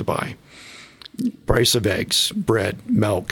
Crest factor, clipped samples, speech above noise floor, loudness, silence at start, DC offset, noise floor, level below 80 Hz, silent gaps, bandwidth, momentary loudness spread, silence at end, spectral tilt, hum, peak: 20 dB; under 0.1%; 23 dB; -20 LUFS; 0 s; under 0.1%; -43 dBFS; -40 dBFS; none; 18.5 kHz; 22 LU; 0 s; -4 dB/octave; none; -2 dBFS